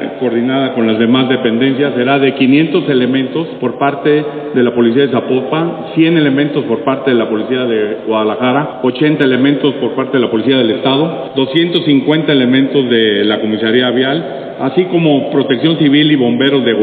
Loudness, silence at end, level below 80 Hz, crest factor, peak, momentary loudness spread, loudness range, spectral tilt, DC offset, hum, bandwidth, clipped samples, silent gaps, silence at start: -12 LUFS; 0 s; -58 dBFS; 12 dB; 0 dBFS; 5 LU; 2 LU; -9 dB/octave; under 0.1%; none; 4.7 kHz; under 0.1%; none; 0 s